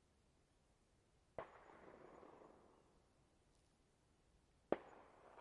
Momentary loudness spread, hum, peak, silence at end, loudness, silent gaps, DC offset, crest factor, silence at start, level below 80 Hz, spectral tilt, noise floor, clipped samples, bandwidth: 18 LU; none; -20 dBFS; 0 s; -53 LUFS; none; under 0.1%; 38 dB; 0.05 s; -80 dBFS; -6.5 dB/octave; -78 dBFS; under 0.1%; 10.5 kHz